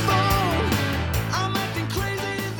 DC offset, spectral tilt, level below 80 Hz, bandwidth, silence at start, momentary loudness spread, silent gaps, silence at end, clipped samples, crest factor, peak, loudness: under 0.1%; -5 dB/octave; -36 dBFS; over 20 kHz; 0 s; 6 LU; none; 0 s; under 0.1%; 16 dB; -8 dBFS; -23 LUFS